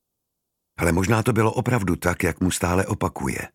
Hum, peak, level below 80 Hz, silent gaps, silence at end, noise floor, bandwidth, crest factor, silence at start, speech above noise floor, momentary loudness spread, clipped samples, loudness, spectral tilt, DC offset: none; -2 dBFS; -46 dBFS; none; 0.05 s; -80 dBFS; 16.5 kHz; 20 dB; 0.8 s; 58 dB; 5 LU; under 0.1%; -22 LUFS; -5.5 dB/octave; under 0.1%